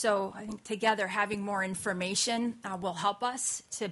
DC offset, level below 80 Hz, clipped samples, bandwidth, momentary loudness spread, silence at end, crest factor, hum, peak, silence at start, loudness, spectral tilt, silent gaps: under 0.1%; -68 dBFS; under 0.1%; 11.5 kHz; 7 LU; 0 s; 20 dB; none; -12 dBFS; 0 s; -31 LUFS; -2.5 dB/octave; none